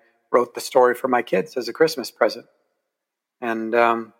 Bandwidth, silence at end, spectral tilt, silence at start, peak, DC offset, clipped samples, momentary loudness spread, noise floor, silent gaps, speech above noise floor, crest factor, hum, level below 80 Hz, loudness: 17 kHz; 0.15 s; -4 dB/octave; 0.3 s; -2 dBFS; under 0.1%; under 0.1%; 10 LU; -83 dBFS; none; 62 dB; 20 dB; none; -76 dBFS; -21 LUFS